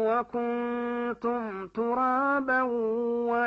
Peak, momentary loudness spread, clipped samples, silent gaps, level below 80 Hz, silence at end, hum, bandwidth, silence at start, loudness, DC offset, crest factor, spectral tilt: -16 dBFS; 6 LU; under 0.1%; none; -66 dBFS; 0 s; none; 5.4 kHz; 0 s; -28 LUFS; under 0.1%; 12 dB; -7.5 dB/octave